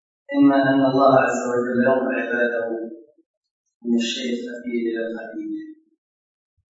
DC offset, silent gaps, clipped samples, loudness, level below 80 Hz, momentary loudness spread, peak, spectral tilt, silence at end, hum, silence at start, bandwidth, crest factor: under 0.1%; 3.26-3.41 s, 3.51-3.64 s, 3.75-3.80 s; under 0.1%; -21 LUFS; -72 dBFS; 15 LU; -2 dBFS; -5.5 dB/octave; 1.05 s; none; 0.3 s; 8 kHz; 18 dB